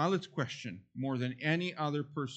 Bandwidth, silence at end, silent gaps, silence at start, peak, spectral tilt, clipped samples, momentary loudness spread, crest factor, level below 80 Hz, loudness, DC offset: 8.4 kHz; 0 s; none; 0 s; -18 dBFS; -6 dB/octave; under 0.1%; 8 LU; 16 dB; -78 dBFS; -36 LUFS; under 0.1%